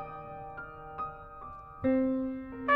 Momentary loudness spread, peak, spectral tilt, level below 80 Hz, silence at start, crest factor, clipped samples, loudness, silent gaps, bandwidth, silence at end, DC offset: 17 LU; -14 dBFS; -9 dB/octave; -56 dBFS; 0 s; 20 dB; under 0.1%; -35 LUFS; none; 4.2 kHz; 0 s; under 0.1%